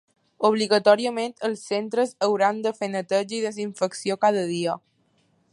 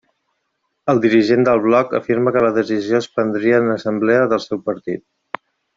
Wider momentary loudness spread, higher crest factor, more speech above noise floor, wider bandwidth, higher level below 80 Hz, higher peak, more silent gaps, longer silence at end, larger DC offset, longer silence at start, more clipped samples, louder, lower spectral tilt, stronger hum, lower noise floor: second, 9 LU vs 14 LU; first, 20 dB vs 14 dB; second, 42 dB vs 56 dB; first, 11.5 kHz vs 7.6 kHz; second, -78 dBFS vs -58 dBFS; about the same, -4 dBFS vs -2 dBFS; neither; about the same, 0.75 s vs 0.75 s; neither; second, 0.4 s vs 0.85 s; neither; second, -24 LUFS vs -17 LUFS; second, -4.5 dB/octave vs -7 dB/octave; neither; second, -66 dBFS vs -72 dBFS